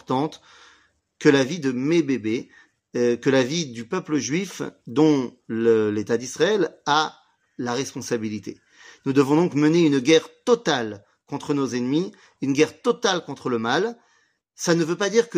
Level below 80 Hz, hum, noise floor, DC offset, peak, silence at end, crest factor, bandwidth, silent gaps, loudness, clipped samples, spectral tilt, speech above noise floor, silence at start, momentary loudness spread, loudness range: -68 dBFS; none; -64 dBFS; under 0.1%; -4 dBFS; 0 s; 20 dB; 15.5 kHz; none; -22 LUFS; under 0.1%; -5 dB/octave; 43 dB; 0.1 s; 12 LU; 3 LU